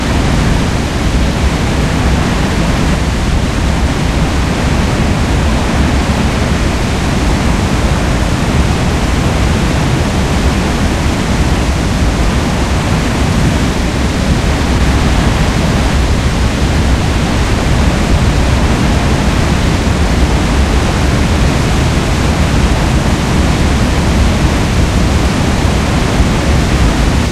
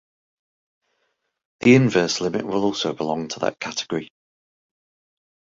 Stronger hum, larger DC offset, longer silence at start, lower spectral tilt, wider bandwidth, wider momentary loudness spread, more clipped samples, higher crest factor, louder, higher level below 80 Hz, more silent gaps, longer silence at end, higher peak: neither; first, 0.4% vs under 0.1%; second, 0 s vs 1.6 s; about the same, -5.5 dB/octave vs -5 dB/octave; first, 14 kHz vs 7.8 kHz; second, 2 LU vs 12 LU; neither; second, 10 dB vs 22 dB; first, -12 LUFS vs -21 LUFS; first, -16 dBFS vs -62 dBFS; neither; second, 0 s vs 1.55 s; about the same, 0 dBFS vs -2 dBFS